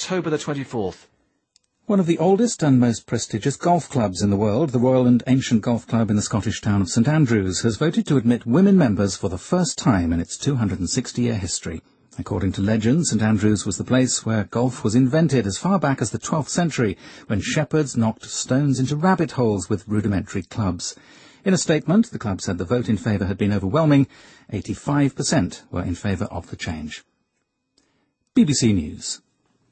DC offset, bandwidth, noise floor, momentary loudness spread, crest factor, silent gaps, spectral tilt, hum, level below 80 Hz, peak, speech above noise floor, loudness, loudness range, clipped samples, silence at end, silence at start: under 0.1%; 8.8 kHz; -74 dBFS; 10 LU; 16 dB; none; -5.5 dB/octave; none; -48 dBFS; -6 dBFS; 54 dB; -21 LUFS; 5 LU; under 0.1%; 0.55 s; 0 s